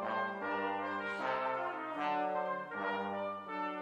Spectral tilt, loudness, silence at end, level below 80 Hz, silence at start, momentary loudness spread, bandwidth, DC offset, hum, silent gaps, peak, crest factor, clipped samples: -6 dB/octave; -37 LUFS; 0 s; -82 dBFS; 0 s; 4 LU; 11 kHz; under 0.1%; none; none; -24 dBFS; 14 dB; under 0.1%